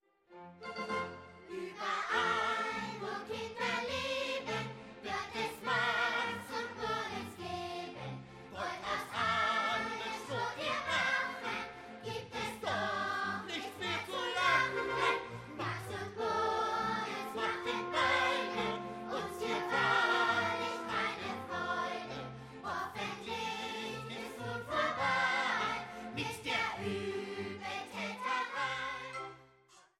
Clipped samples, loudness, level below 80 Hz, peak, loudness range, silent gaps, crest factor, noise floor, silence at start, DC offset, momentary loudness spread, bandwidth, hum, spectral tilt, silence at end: under 0.1%; -36 LUFS; -68 dBFS; -18 dBFS; 4 LU; none; 20 dB; -64 dBFS; 0.3 s; under 0.1%; 12 LU; 16 kHz; none; -3.5 dB/octave; 0.2 s